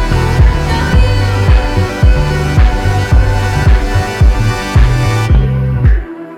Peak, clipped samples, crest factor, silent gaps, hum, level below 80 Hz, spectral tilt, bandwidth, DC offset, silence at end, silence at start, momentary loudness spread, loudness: 0 dBFS; under 0.1%; 10 dB; none; none; -12 dBFS; -6.5 dB/octave; 13 kHz; under 0.1%; 0 s; 0 s; 3 LU; -12 LUFS